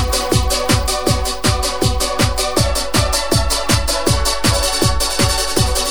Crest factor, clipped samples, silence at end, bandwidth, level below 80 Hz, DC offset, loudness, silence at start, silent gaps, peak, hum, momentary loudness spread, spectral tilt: 16 dB; under 0.1%; 0 s; over 20 kHz; -22 dBFS; 3%; -16 LUFS; 0 s; none; 0 dBFS; none; 2 LU; -3.5 dB/octave